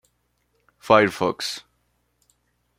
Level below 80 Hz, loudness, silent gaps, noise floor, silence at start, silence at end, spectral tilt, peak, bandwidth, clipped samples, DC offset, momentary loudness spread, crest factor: -64 dBFS; -20 LUFS; none; -70 dBFS; 0.85 s; 1.2 s; -4.5 dB/octave; -2 dBFS; 16 kHz; under 0.1%; under 0.1%; 13 LU; 24 dB